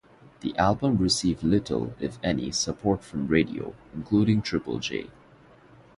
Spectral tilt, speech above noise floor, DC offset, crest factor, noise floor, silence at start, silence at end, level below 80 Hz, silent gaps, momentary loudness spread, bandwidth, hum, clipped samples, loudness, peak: -5 dB/octave; 28 dB; under 0.1%; 20 dB; -54 dBFS; 0.45 s; 0.85 s; -48 dBFS; none; 13 LU; 11.5 kHz; none; under 0.1%; -26 LUFS; -6 dBFS